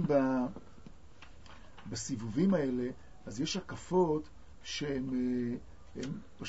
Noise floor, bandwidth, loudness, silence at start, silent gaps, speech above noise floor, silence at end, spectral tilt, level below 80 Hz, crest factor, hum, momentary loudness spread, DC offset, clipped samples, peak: -56 dBFS; 7.6 kHz; -34 LUFS; 0 s; none; 22 dB; 0 s; -6 dB/octave; -58 dBFS; 18 dB; none; 22 LU; 0.3%; under 0.1%; -16 dBFS